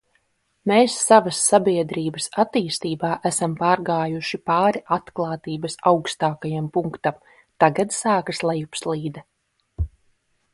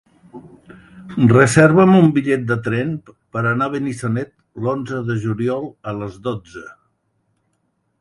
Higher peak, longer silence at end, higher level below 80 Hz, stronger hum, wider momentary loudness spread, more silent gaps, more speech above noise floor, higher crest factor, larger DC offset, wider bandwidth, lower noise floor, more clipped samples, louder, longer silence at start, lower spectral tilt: about the same, 0 dBFS vs 0 dBFS; second, 0.65 s vs 1.3 s; first, -46 dBFS vs -52 dBFS; neither; second, 11 LU vs 18 LU; neither; second, 46 dB vs 51 dB; about the same, 22 dB vs 18 dB; neither; about the same, 12 kHz vs 11.5 kHz; about the same, -67 dBFS vs -68 dBFS; neither; second, -21 LUFS vs -17 LUFS; first, 0.65 s vs 0.35 s; second, -4.5 dB/octave vs -7 dB/octave